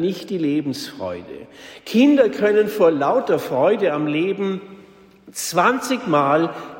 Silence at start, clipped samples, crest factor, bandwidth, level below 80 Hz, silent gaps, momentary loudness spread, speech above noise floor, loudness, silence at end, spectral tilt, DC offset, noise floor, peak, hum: 0 s; under 0.1%; 16 dB; 16.5 kHz; -64 dBFS; none; 15 LU; 27 dB; -19 LUFS; 0 s; -5 dB/octave; under 0.1%; -46 dBFS; -4 dBFS; none